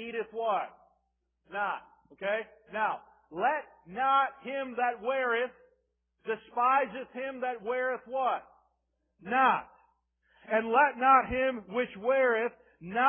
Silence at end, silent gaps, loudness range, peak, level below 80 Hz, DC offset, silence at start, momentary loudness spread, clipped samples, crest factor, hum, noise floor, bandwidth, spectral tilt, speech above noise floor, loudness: 0 s; none; 7 LU; -10 dBFS; -64 dBFS; under 0.1%; 0 s; 13 LU; under 0.1%; 20 dB; none; -79 dBFS; 3.5 kHz; -8 dB/octave; 49 dB; -30 LUFS